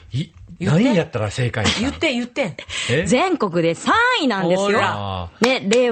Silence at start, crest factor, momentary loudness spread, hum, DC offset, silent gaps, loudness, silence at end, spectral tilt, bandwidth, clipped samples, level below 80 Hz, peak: 0.1 s; 18 dB; 9 LU; none; under 0.1%; none; -19 LUFS; 0 s; -5 dB/octave; 9.4 kHz; under 0.1%; -48 dBFS; 0 dBFS